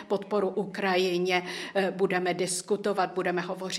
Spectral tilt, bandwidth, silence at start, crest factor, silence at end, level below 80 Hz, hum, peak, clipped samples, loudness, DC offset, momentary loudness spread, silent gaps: -4 dB/octave; 15 kHz; 0 s; 18 dB; 0 s; -76 dBFS; none; -10 dBFS; under 0.1%; -28 LUFS; under 0.1%; 4 LU; none